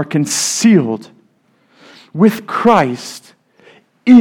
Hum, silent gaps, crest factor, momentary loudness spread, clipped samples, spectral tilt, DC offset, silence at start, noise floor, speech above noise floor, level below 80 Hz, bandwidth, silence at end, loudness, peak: none; none; 14 dB; 17 LU; 0.3%; -5 dB/octave; under 0.1%; 0 s; -56 dBFS; 42 dB; -60 dBFS; 17 kHz; 0 s; -13 LUFS; 0 dBFS